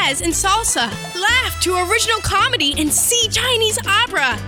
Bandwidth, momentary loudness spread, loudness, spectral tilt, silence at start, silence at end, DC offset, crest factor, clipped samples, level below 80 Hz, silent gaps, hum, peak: 18 kHz; 4 LU; -15 LUFS; -1.5 dB/octave; 0 s; 0 s; under 0.1%; 14 dB; under 0.1%; -36 dBFS; none; none; -4 dBFS